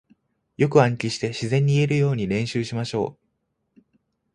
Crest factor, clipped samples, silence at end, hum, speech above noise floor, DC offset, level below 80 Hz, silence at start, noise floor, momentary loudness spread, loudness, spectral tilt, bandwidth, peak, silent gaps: 22 dB; under 0.1%; 1.25 s; none; 53 dB; under 0.1%; -56 dBFS; 0.6 s; -74 dBFS; 8 LU; -22 LUFS; -6.5 dB/octave; 10.5 kHz; -2 dBFS; none